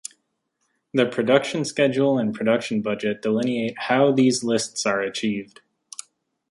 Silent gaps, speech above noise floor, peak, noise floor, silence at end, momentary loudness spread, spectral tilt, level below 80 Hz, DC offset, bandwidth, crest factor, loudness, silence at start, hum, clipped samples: none; 52 dB; -2 dBFS; -74 dBFS; 1.05 s; 12 LU; -4.5 dB/octave; -68 dBFS; under 0.1%; 11.5 kHz; 20 dB; -22 LUFS; 0.95 s; none; under 0.1%